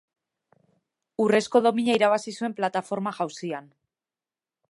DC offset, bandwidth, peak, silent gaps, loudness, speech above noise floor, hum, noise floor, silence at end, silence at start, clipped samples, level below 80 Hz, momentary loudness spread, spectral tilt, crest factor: under 0.1%; 11.5 kHz; -6 dBFS; none; -25 LUFS; over 66 dB; none; under -90 dBFS; 1.1 s; 1.2 s; under 0.1%; -78 dBFS; 13 LU; -5 dB/octave; 20 dB